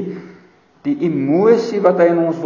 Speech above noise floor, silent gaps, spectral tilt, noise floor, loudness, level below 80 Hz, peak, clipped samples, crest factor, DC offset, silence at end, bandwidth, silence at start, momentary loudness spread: 34 dB; none; -8 dB/octave; -48 dBFS; -15 LUFS; -70 dBFS; 0 dBFS; under 0.1%; 16 dB; under 0.1%; 0 s; 7.2 kHz; 0 s; 14 LU